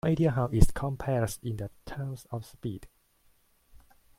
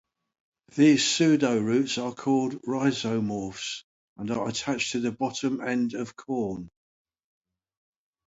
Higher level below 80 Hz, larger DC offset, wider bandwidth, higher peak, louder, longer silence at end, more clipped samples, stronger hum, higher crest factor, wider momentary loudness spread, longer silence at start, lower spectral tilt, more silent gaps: first, -36 dBFS vs -64 dBFS; neither; first, 15.5 kHz vs 8 kHz; first, -2 dBFS vs -8 dBFS; second, -31 LUFS vs -26 LUFS; second, 0.4 s vs 1.6 s; neither; neither; first, 26 dB vs 18 dB; about the same, 13 LU vs 13 LU; second, 0.05 s vs 0.75 s; first, -7 dB/octave vs -4.5 dB/octave; second, none vs 3.84-4.16 s